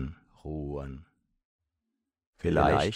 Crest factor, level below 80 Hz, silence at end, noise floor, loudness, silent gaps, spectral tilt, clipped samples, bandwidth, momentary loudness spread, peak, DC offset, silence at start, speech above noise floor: 22 dB; -44 dBFS; 0 s; -85 dBFS; -30 LUFS; 1.45-1.59 s, 2.27-2.33 s; -6.5 dB/octave; under 0.1%; 12 kHz; 21 LU; -10 dBFS; under 0.1%; 0 s; 58 dB